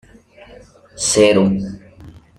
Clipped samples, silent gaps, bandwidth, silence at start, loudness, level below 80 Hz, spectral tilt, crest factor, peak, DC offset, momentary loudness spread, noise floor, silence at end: under 0.1%; none; 14 kHz; 0.95 s; -15 LUFS; -48 dBFS; -4 dB/octave; 18 dB; -2 dBFS; under 0.1%; 18 LU; -44 dBFS; 0.3 s